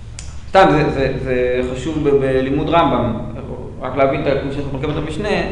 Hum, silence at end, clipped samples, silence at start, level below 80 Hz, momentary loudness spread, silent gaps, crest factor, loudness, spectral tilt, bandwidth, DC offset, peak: none; 0 s; under 0.1%; 0 s; -32 dBFS; 14 LU; none; 16 dB; -17 LUFS; -6.5 dB/octave; 10.5 kHz; under 0.1%; 0 dBFS